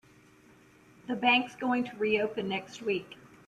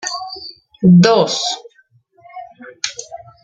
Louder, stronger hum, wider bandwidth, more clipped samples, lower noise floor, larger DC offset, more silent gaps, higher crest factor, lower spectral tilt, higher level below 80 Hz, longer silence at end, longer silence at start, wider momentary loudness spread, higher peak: second, -30 LUFS vs -14 LUFS; neither; first, 12 kHz vs 7.8 kHz; neither; first, -59 dBFS vs -55 dBFS; neither; neither; about the same, 20 dB vs 16 dB; about the same, -5 dB/octave vs -5.5 dB/octave; second, -72 dBFS vs -56 dBFS; about the same, 0.2 s vs 0.25 s; first, 1.05 s vs 0.05 s; second, 12 LU vs 25 LU; second, -12 dBFS vs -2 dBFS